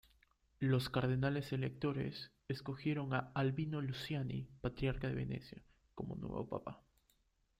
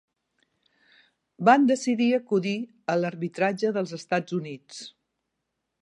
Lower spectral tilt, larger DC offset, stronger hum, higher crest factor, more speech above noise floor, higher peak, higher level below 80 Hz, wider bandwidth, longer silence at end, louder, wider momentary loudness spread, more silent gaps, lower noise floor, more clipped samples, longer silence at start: first, -7.5 dB/octave vs -5.5 dB/octave; neither; neither; about the same, 18 dB vs 22 dB; second, 38 dB vs 56 dB; second, -22 dBFS vs -4 dBFS; first, -60 dBFS vs -80 dBFS; first, 14.5 kHz vs 11 kHz; about the same, 0.8 s vs 0.9 s; second, -40 LUFS vs -25 LUFS; second, 12 LU vs 19 LU; neither; second, -77 dBFS vs -81 dBFS; neither; second, 0.6 s vs 1.4 s